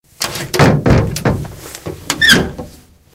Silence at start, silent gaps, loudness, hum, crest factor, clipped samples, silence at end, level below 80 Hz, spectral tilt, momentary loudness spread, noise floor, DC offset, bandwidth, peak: 0.2 s; none; -13 LUFS; none; 14 dB; 0.1%; 0.45 s; -30 dBFS; -4 dB/octave; 19 LU; -40 dBFS; under 0.1%; 18 kHz; 0 dBFS